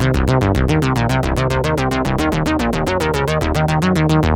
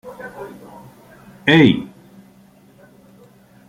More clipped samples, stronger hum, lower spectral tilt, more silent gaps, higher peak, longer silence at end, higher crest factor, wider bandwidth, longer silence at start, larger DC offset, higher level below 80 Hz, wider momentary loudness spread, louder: neither; neither; about the same, -6.5 dB/octave vs -7 dB/octave; neither; about the same, -2 dBFS vs -2 dBFS; second, 0 s vs 1.85 s; second, 12 dB vs 20 dB; first, 17 kHz vs 15 kHz; about the same, 0 s vs 0.05 s; neither; first, -26 dBFS vs -56 dBFS; second, 2 LU vs 25 LU; second, -17 LUFS vs -14 LUFS